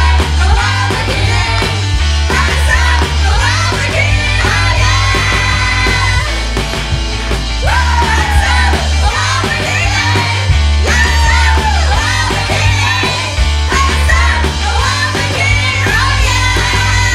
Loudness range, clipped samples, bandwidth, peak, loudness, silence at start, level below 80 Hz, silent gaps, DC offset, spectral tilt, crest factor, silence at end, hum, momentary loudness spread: 2 LU; under 0.1%; 13.5 kHz; 0 dBFS; -11 LUFS; 0 s; -16 dBFS; none; under 0.1%; -3.5 dB/octave; 10 dB; 0 s; none; 3 LU